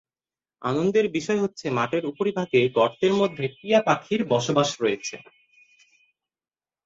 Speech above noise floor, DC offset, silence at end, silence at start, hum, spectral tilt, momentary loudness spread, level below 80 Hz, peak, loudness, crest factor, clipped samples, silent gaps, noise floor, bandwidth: over 67 dB; under 0.1%; 1.65 s; 0.6 s; none; -5 dB/octave; 8 LU; -66 dBFS; -6 dBFS; -24 LUFS; 18 dB; under 0.1%; none; under -90 dBFS; 8 kHz